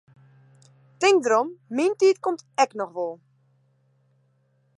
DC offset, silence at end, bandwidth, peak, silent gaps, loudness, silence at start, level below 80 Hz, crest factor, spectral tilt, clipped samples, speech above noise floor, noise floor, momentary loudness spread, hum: under 0.1%; 1.6 s; 11.5 kHz; -8 dBFS; none; -23 LUFS; 1 s; -84 dBFS; 18 dB; -3 dB/octave; under 0.1%; 44 dB; -66 dBFS; 11 LU; none